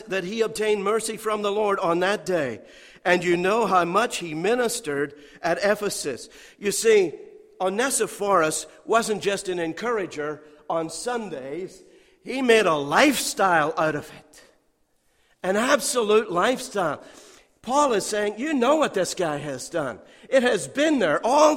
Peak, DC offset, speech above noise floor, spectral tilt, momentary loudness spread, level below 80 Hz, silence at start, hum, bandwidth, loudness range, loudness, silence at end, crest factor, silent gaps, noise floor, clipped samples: -4 dBFS; under 0.1%; 43 dB; -3.5 dB/octave; 12 LU; -60 dBFS; 0 s; none; 16.5 kHz; 3 LU; -23 LUFS; 0 s; 20 dB; none; -66 dBFS; under 0.1%